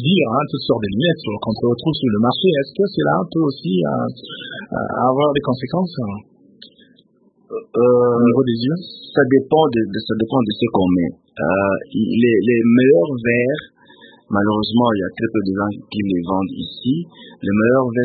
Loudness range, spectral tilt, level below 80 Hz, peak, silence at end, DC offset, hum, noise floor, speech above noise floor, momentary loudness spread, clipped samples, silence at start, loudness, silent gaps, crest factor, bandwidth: 4 LU; -12 dB/octave; -52 dBFS; -2 dBFS; 0 s; under 0.1%; none; -56 dBFS; 39 dB; 11 LU; under 0.1%; 0 s; -18 LUFS; none; 16 dB; 4.8 kHz